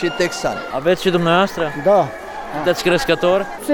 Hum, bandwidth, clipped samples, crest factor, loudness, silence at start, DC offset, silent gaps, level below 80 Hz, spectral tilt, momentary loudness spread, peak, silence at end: none; 19.5 kHz; under 0.1%; 14 dB; -17 LUFS; 0 s; under 0.1%; none; -44 dBFS; -5 dB/octave; 7 LU; -4 dBFS; 0 s